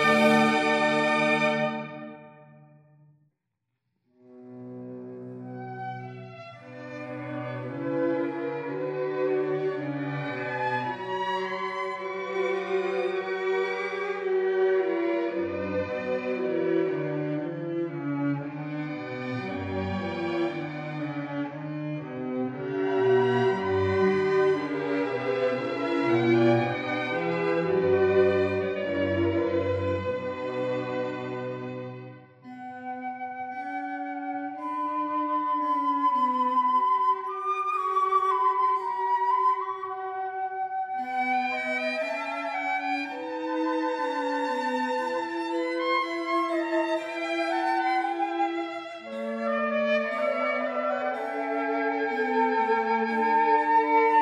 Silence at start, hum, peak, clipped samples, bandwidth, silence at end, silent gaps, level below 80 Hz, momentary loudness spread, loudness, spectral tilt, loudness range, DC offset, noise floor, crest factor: 0 s; none; -10 dBFS; under 0.1%; 11.5 kHz; 0 s; none; -74 dBFS; 12 LU; -27 LUFS; -6.5 dB/octave; 9 LU; under 0.1%; -82 dBFS; 18 dB